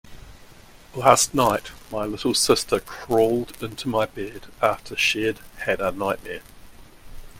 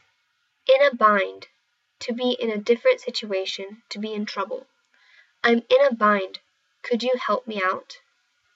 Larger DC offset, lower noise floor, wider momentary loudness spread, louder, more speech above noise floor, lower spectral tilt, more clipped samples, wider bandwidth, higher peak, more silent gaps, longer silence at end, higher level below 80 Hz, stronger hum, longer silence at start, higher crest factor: neither; second, -47 dBFS vs -70 dBFS; about the same, 15 LU vs 15 LU; about the same, -22 LUFS vs -22 LUFS; second, 24 dB vs 48 dB; second, -3 dB/octave vs -4.5 dB/octave; neither; first, 16.5 kHz vs 7.8 kHz; first, 0 dBFS vs -4 dBFS; neither; second, 0 s vs 0.6 s; first, -48 dBFS vs -86 dBFS; neither; second, 0.05 s vs 0.7 s; about the same, 24 dB vs 20 dB